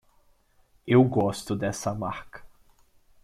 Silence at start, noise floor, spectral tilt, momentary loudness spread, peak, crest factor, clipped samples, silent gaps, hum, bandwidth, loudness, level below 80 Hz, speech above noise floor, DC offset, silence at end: 0.85 s; -63 dBFS; -6.5 dB/octave; 21 LU; -8 dBFS; 20 dB; under 0.1%; none; none; 14 kHz; -25 LUFS; -56 dBFS; 38 dB; under 0.1%; 0.75 s